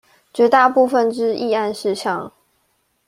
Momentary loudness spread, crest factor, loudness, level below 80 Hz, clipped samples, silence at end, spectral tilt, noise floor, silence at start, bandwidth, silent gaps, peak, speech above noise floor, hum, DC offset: 13 LU; 16 dB; -17 LUFS; -66 dBFS; under 0.1%; 0.8 s; -4.5 dB/octave; -66 dBFS; 0.35 s; 15 kHz; none; -2 dBFS; 49 dB; none; under 0.1%